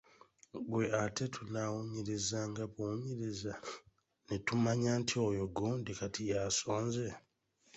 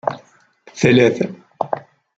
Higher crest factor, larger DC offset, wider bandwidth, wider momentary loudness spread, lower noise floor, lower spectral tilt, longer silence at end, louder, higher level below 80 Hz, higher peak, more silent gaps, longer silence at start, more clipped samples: about the same, 18 dB vs 18 dB; neither; about the same, 8.2 kHz vs 8 kHz; second, 10 LU vs 19 LU; first, -73 dBFS vs -51 dBFS; second, -4.5 dB/octave vs -6 dB/octave; first, 0.55 s vs 0.4 s; second, -37 LUFS vs -18 LUFS; second, -64 dBFS vs -56 dBFS; second, -20 dBFS vs -2 dBFS; neither; first, 0.55 s vs 0.05 s; neither